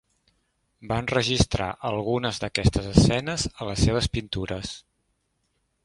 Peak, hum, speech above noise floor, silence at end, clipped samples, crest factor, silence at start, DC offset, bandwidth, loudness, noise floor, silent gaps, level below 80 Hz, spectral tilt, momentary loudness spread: 0 dBFS; none; 49 dB; 1.05 s; under 0.1%; 26 dB; 0.8 s; under 0.1%; 11.5 kHz; -25 LUFS; -73 dBFS; none; -36 dBFS; -5 dB/octave; 10 LU